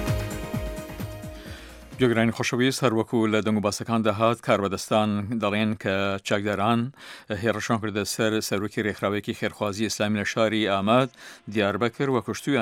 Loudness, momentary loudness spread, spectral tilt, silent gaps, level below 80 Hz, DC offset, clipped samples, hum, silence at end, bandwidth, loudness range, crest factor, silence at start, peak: -25 LUFS; 13 LU; -5 dB/octave; none; -46 dBFS; under 0.1%; under 0.1%; none; 0 s; 16.5 kHz; 3 LU; 20 dB; 0 s; -4 dBFS